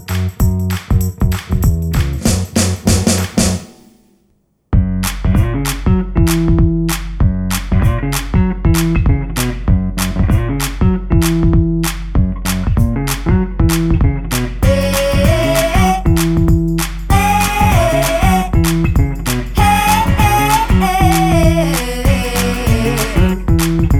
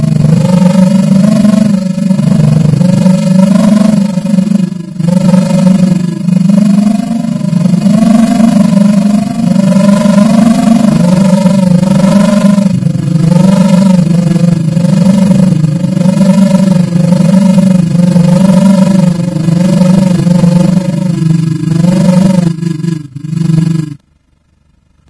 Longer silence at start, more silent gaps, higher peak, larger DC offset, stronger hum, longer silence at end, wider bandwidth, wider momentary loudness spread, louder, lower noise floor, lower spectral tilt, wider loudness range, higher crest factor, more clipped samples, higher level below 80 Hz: about the same, 0 s vs 0 s; neither; about the same, 0 dBFS vs 0 dBFS; neither; neither; second, 0 s vs 1.15 s; first, 19 kHz vs 11 kHz; about the same, 6 LU vs 5 LU; second, -14 LUFS vs -7 LUFS; first, -58 dBFS vs -51 dBFS; second, -5.5 dB/octave vs -8 dB/octave; about the same, 3 LU vs 2 LU; first, 12 dB vs 6 dB; second, under 0.1% vs 4%; first, -18 dBFS vs -40 dBFS